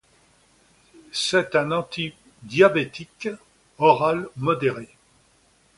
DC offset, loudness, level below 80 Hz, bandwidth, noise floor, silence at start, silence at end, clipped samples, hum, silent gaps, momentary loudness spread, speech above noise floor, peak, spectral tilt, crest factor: under 0.1%; -22 LUFS; -62 dBFS; 11.5 kHz; -60 dBFS; 1.15 s; 0.9 s; under 0.1%; none; none; 15 LU; 39 dB; -2 dBFS; -4.5 dB/octave; 22 dB